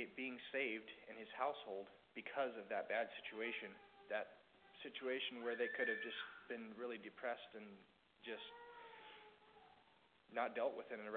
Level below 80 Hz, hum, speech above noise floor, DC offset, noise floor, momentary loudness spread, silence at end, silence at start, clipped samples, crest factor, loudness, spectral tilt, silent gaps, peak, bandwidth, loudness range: -90 dBFS; none; 26 dB; under 0.1%; -73 dBFS; 18 LU; 0 s; 0 s; under 0.1%; 20 dB; -46 LUFS; -0.5 dB/octave; none; -28 dBFS; 4.5 kHz; 7 LU